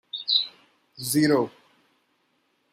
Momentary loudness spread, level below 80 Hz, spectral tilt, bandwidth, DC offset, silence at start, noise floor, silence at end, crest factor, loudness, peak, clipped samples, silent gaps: 13 LU; -70 dBFS; -3.5 dB/octave; 16 kHz; under 0.1%; 0.15 s; -70 dBFS; 1.25 s; 20 dB; -24 LUFS; -8 dBFS; under 0.1%; none